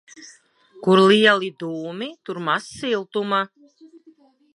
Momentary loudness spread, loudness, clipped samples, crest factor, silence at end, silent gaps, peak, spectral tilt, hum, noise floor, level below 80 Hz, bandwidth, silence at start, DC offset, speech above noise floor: 17 LU; -20 LUFS; under 0.1%; 20 dB; 0.7 s; none; -2 dBFS; -5 dB/octave; none; -54 dBFS; -70 dBFS; 11.5 kHz; 0.15 s; under 0.1%; 34 dB